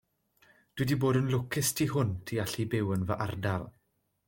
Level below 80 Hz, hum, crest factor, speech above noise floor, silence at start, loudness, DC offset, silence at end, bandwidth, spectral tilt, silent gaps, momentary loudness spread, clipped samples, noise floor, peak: -60 dBFS; none; 16 dB; 36 dB; 0.75 s; -31 LUFS; under 0.1%; 0.6 s; 17 kHz; -5.5 dB/octave; none; 7 LU; under 0.1%; -66 dBFS; -14 dBFS